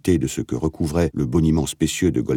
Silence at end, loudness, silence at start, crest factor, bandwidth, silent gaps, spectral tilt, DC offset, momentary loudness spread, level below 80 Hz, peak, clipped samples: 0 s; -21 LUFS; 0.05 s; 14 dB; 17.5 kHz; none; -6 dB/octave; under 0.1%; 6 LU; -38 dBFS; -6 dBFS; under 0.1%